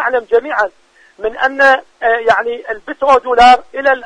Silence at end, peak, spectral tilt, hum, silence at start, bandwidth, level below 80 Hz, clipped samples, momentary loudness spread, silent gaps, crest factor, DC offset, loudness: 0 s; 0 dBFS; -2.5 dB/octave; none; 0 s; 10 kHz; -44 dBFS; under 0.1%; 14 LU; none; 12 dB; under 0.1%; -12 LUFS